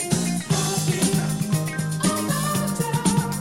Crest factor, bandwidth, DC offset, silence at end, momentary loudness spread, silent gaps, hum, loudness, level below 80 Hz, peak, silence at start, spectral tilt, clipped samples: 16 dB; 16.5 kHz; under 0.1%; 0 s; 3 LU; none; none; -23 LUFS; -48 dBFS; -6 dBFS; 0 s; -4.5 dB/octave; under 0.1%